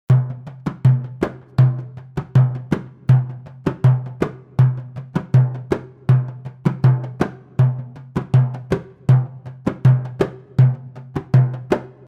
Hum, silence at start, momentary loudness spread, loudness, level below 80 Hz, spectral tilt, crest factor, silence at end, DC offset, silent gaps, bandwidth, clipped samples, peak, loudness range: none; 0.1 s; 12 LU; -19 LUFS; -46 dBFS; -9.5 dB/octave; 14 dB; 0.2 s; under 0.1%; none; 4.7 kHz; under 0.1%; -4 dBFS; 1 LU